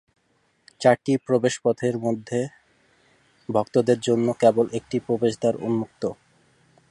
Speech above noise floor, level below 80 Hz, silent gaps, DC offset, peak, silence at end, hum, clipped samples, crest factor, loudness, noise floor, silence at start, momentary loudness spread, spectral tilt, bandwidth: 45 dB; -64 dBFS; none; under 0.1%; -4 dBFS; 0.8 s; none; under 0.1%; 20 dB; -23 LUFS; -67 dBFS; 0.8 s; 9 LU; -6 dB/octave; 11.5 kHz